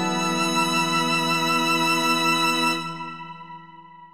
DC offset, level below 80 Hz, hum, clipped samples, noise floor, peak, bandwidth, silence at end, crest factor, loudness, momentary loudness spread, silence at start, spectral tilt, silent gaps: 0.5%; -66 dBFS; none; under 0.1%; -45 dBFS; -10 dBFS; 15.5 kHz; 0.05 s; 14 dB; -21 LUFS; 17 LU; 0 s; -3 dB/octave; none